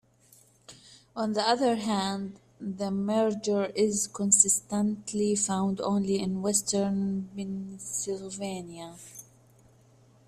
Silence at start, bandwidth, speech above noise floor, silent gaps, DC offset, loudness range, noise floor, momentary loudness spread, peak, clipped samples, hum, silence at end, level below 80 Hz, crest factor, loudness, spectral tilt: 0.7 s; 15 kHz; 32 dB; none; under 0.1%; 6 LU; -60 dBFS; 17 LU; -8 dBFS; under 0.1%; none; 1.05 s; -66 dBFS; 22 dB; -28 LUFS; -4 dB/octave